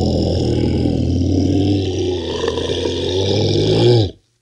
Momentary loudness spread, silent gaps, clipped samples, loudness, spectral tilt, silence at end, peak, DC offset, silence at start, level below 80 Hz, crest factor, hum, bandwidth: 7 LU; none; under 0.1%; -17 LUFS; -7 dB/octave; 0.3 s; -2 dBFS; under 0.1%; 0 s; -36 dBFS; 14 dB; none; 10.5 kHz